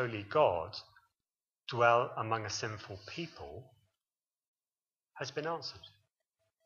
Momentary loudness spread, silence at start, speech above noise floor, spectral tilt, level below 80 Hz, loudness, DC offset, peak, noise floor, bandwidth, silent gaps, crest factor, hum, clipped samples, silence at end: 21 LU; 0 s; over 56 dB; -4.5 dB/octave; -70 dBFS; -34 LUFS; under 0.1%; -12 dBFS; under -90 dBFS; 7.4 kHz; 4.47-4.55 s; 24 dB; none; under 0.1%; 0.8 s